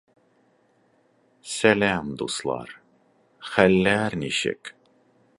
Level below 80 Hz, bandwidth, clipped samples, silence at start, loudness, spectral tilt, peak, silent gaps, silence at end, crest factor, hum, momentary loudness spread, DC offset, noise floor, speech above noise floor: -56 dBFS; 11.5 kHz; under 0.1%; 1.45 s; -23 LUFS; -4.5 dB/octave; 0 dBFS; none; 0.65 s; 26 dB; none; 22 LU; under 0.1%; -63 dBFS; 41 dB